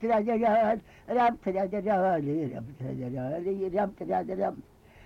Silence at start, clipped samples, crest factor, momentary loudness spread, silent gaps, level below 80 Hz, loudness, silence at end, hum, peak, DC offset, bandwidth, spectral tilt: 0 s; under 0.1%; 12 dB; 11 LU; none; -58 dBFS; -29 LUFS; 0 s; none; -18 dBFS; under 0.1%; 7.2 kHz; -8.5 dB/octave